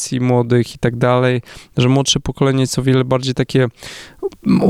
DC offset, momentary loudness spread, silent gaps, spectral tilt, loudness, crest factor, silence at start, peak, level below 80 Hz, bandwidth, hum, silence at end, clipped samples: under 0.1%; 11 LU; none; -5.5 dB/octave; -16 LUFS; 14 dB; 0 s; -2 dBFS; -40 dBFS; 13 kHz; none; 0 s; under 0.1%